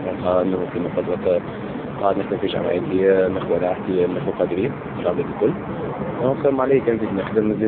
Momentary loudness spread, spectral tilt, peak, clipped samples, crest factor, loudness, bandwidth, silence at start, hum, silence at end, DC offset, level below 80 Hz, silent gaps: 7 LU; -12 dB/octave; -4 dBFS; under 0.1%; 16 dB; -21 LUFS; 4.3 kHz; 0 s; none; 0 s; under 0.1%; -48 dBFS; none